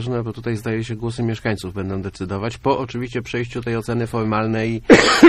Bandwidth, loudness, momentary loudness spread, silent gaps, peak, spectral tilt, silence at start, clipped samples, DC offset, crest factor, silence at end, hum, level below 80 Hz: 13 kHz; -21 LUFS; 11 LU; none; 0 dBFS; -5.5 dB/octave; 0 s; 0.1%; under 0.1%; 18 dB; 0 s; none; -42 dBFS